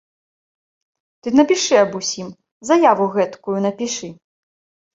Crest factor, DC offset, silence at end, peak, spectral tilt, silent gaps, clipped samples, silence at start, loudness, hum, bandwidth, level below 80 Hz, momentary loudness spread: 18 dB; under 0.1%; 0.8 s; -2 dBFS; -4 dB/octave; 2.52-2.61 s; under 0.1%; 1.25 s; -17 LUFS; none; 8 kHz; -64 dBFS; 16 LU